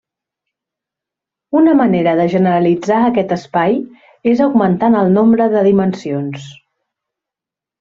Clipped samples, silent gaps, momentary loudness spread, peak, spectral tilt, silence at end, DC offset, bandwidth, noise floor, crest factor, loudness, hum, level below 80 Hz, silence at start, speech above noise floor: under 0.1%; none; 10 LU; -2 dBFS; -8 dB/octave; 1.3 s; under 0.1%; 7.4 kHz; -87 dBFS; 14 dB; -13 LUFS; none; -54 dBFS; 1.5 s; 74 dB